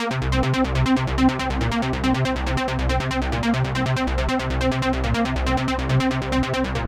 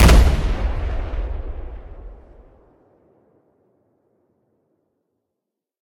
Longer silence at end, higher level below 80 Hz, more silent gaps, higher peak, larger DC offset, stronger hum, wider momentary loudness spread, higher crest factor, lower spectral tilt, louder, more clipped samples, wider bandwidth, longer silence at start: second, 0 s vs 3.75 s; second, -28 dBFS vs -22 dBFS; neither; second, -6 dBFS vs 0 dBFS; neither; neither; second, 3 LU vs 26 LU; second, 14 dB vs 20 dB; about the same, -6 dB/octave vs -5.5 dB/octave; about the same, -22 LUFS vs -22 LUFS; neither; second, 13 kHz vs 16.5 kHz; about the same, 0 s vs 0 s